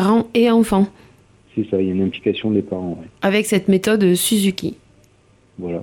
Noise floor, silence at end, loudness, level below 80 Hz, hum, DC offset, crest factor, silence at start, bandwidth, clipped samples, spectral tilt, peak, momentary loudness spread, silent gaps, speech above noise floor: -54 dBFS; 0 s; -18 LUFS; -50 dBFS; none; under 0.1%; 14 dB; 0 s; 17.5 kHz; under 0.1%; -5 dB/octave; -4 dBFS; 13 LU; none; 37 dB